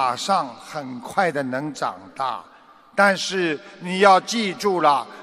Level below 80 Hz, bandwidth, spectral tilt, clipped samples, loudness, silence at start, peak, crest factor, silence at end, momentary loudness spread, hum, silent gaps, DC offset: -70 dBFS; 14.5 kHz; -4 dB/octave; under 0.1%; -21 LUFS; 0 s; -2 dBFS; 20 dB; 0 s; 14 LU; none; none; under 0.1%